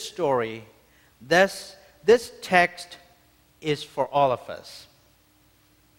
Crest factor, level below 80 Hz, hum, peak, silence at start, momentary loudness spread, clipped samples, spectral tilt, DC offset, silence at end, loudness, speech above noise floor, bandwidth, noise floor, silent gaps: 22 dB; -62 dBFS; none; -4 dBFS; 0 s; 21 LU; under 0.1%; -4 dB/octave; under 0.1%; 1.2 s; -23 LUFS; 37 dB; 16.5 kHz; -61 dBFS; none